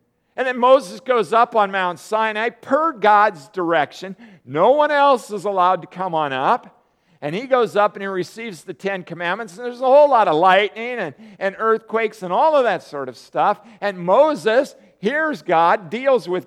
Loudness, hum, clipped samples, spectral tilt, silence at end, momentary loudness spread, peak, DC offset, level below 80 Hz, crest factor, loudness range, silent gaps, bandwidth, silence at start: -18 LUFS; none; under 0.1%; -5 dB/octave; 0.05 s; 13 LU; -2 dBFS; under 0.1%; -76 dBFS; 18 dB; 4 LU; none; 13 kHz; 0.35 s